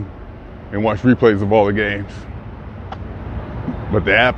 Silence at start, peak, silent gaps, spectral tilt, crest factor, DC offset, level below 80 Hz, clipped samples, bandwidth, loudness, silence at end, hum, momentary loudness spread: 0 s; 0 dBFS; none; -8 dB/octave; 18 dB; under 0.1%; -36 dBFS; under 0.1%; 8 kHz; -17 LUFS; 0 s; none; 20 LU